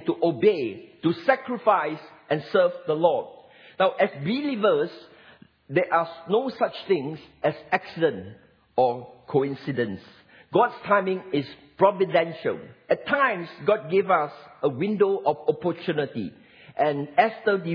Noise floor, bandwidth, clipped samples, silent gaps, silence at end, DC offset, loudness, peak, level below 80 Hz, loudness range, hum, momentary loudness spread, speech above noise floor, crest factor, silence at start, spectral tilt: -53 dBFS; 5.4 kHz; under 0.1%; none; 0 s; under 0.1%; -25 LUFS; -4 dBFS; -70 dBFS; 3 LU; none; 9 LU; 29 dB; 20 dB; 0 s; -8.5 dB/octave